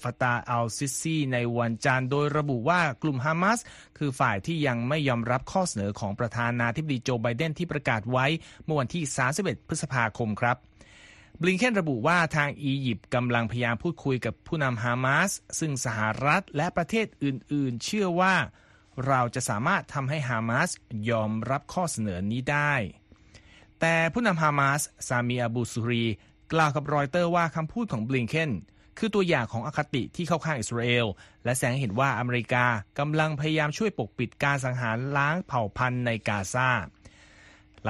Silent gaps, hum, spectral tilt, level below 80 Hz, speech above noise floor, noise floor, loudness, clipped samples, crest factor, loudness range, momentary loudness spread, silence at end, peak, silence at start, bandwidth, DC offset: none; none; -5 dB/octave; -56 dBFS; 28 dB; -54 dBFS; -27 LUFS; under 0.1%; 20 dB; 2 LU; 6 LU; 0 s; -8 dBFS; 0 s; 12.5 kHz; under 0.1%